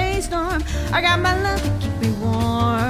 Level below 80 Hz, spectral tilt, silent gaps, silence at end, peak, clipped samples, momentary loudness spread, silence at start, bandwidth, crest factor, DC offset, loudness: -28 dBFS; -5.5 dB/octave; none; 0 s; -6 dBFS; under 0.1%; 6 LU; 0 s; 16 kHz; 14 dB; under 0.1%; -20 LUFS